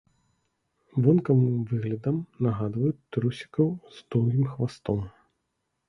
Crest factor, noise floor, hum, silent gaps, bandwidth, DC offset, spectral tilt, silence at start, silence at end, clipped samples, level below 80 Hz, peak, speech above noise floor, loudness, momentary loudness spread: 20 dB; -79 dBFS; none; none; 10 kHz; under 0.1%; -9.5 dB/octave; 0.95 s; 0.8 s; under 0.1%; -56 dBFS; -8 dBFS; 53 dB; -27 LUFS; 9 LU